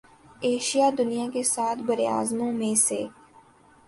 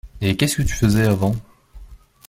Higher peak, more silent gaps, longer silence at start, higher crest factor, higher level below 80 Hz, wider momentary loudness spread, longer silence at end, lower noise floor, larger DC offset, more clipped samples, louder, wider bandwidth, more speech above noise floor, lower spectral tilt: second, -10 dBFS vs -2 dBFS; neither; first, 0.4 s vs 0.05 s; about the same, 16 dB vs 18 dB; second, -68 dBFS vs -34 dBFS; about the same, 6 LU vs 6 LU; first, 0.75 s vs 0.3 s; first, -55 dBFS vs -43 dBFS; neither; neither; second, -25 LUFS vs -19 LUFS; second, 12 kHz vs 16.5 kHz; first, 30 dB vs 25 dB; second, -3 dB/octave vs -5.5 dB/octave